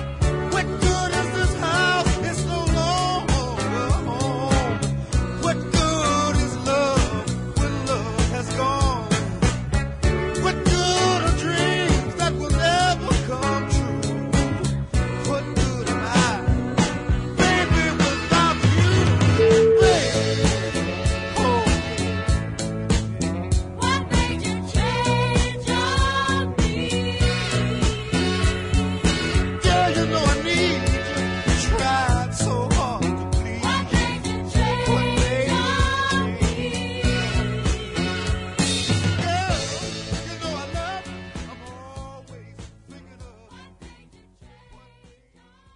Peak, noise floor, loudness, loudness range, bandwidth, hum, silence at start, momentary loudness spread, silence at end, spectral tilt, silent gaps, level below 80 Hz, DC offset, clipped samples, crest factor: -4 dBFS; -56 dBFS; -22 LUFS; 5 LU; 11 kHz; none; 0 s; 7 LU; 1.3 s; -5 dB/octave; none; -30 dBFS; under 0.1%; under 0.1%; 18 dB